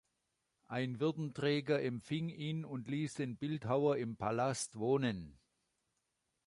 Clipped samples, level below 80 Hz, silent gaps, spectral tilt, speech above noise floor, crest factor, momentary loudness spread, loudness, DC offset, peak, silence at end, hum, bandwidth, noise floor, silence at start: under 0.1%; -70 dBFS; none; -6 dB/octave; 48 dB; 18 dB; 7 LU; -38 LUFS; under 0.1%; -20 dBFS; 1.15 s; none; 11.5 kHz; -85 dBFS; 0.7 s